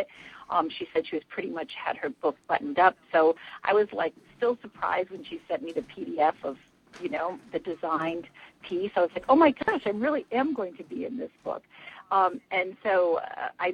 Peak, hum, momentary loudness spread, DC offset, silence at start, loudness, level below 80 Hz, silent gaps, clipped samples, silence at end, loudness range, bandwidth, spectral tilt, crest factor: -8 dBFS; none; 14 LU; under 0.1%; 0 s; -28 LUFS; -68 dBFS; none; under 0.1%; 0 s; 5 LU; 9.4 kHz; -6.5 dB/octave; 20 dB